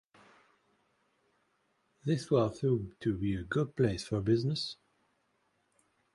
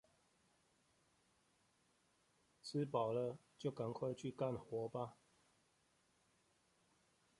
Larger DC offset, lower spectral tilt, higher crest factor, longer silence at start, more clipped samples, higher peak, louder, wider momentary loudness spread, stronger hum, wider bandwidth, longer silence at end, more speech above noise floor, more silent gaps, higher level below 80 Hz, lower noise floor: neither; about the same, -7 dB/octave vs -7 dB/octave; about the same, 20 dB vs 22 dB; second, 2.05 s vs 2.65 s; neither; first, -14 dBFS vs -26 dBFS; first, -32 LUFS vs -45 LUFS; about the same, 7 LU vs 8 LU; neither; about the same, 11.5 kHz vs 11.5 kHz; second, 1.4 s vs 2.25 s; first, 44 dB vs 36 dB; neither; first, -58 dBFS vs -82 dBFS; about the same, -76 dBFS vs -79 dBFS